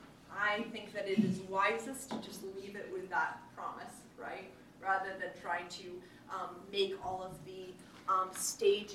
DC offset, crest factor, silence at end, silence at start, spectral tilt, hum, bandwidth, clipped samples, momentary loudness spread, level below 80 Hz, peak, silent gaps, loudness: under 0.1%; 20 dB; 0 s; 0 s; -3.5 dB/octave; none; 15.5 kHz; under 0.1%; 15 LU; -72 dBFS; -18 dBFS; none; -37 LUFS